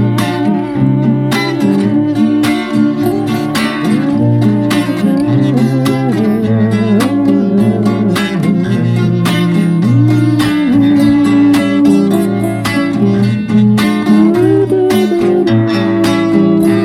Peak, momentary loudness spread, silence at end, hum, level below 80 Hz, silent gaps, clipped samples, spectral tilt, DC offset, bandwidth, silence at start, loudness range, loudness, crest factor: 0 dBFS; 4 LU; 0 s; none; -44 dBFS; none; under 0.1%; -7 dB/octave; under 0.1%; 15.5 kHz; 0 s; 2 LU; -11 LUFS; 10 dB